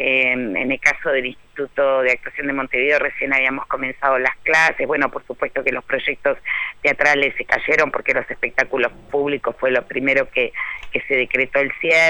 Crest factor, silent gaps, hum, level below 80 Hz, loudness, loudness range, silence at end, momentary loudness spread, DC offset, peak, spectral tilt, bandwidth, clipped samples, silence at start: 18 dB; none; none; -48 dBFS; -19 LUFS; 2 LU; 0 s; 7 LU; under 0.1%; 0 dBFS; -4 dB/octave; 19 kHz; under 0.1%; 0 s